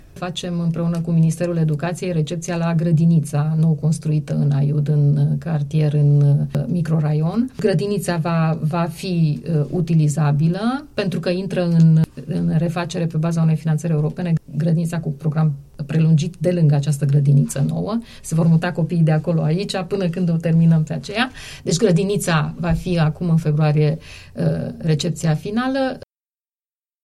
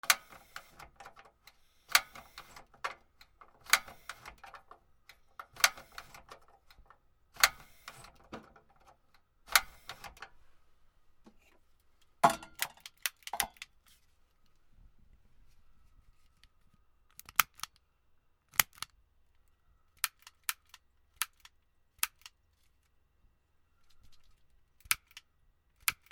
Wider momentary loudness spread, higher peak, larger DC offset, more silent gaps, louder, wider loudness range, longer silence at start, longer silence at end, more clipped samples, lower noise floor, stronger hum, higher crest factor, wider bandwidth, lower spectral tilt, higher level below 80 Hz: second, 7 LU vs 25 LU; second, -4 dBFS vs 0 dBFS; neither; neither; first, -19 LUFS vs -32 LUFS; second, 2 LU vs 8 LU; about the same, 0.15 s vs 0.05 s; first, 1.05 s vs 0.2 s; neither; first, under -90 dBFS vs -71 dBFS; neither; second, 14 dB vs 40 dB; second, 12.5 kHz vs over 20 kHz; first, -7 dB/octave vs 0.5 dB/octave; first, -46 dBFS vs -66 dBFS